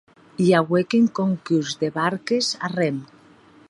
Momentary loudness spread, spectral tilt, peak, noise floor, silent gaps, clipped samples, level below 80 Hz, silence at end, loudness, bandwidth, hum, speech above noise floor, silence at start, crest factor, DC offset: 7 LU; -5.5 dB/octave; -2 dBFS; -51 dBFS; none; under 0.1%; -66 dBFS; 0.65 s; -21 LUFS; 11.5 kHz; none; 30 dB; 0.4 s; 20 dB; under 0.1%